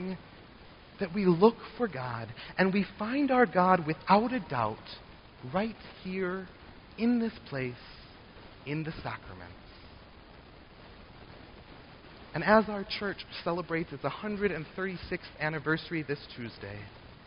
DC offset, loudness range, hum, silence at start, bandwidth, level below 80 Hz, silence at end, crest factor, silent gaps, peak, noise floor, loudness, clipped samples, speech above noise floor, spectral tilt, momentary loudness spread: under 0.1%; 15 LU; none; 0 s; 5.4 kHz; -58 dBFS; 0.05 s; 24 dB; none; -8 dBFS; -52 dBFS; -31 LUFS; under 0.1%; 22 dB; -5 dB/octave; 26 LU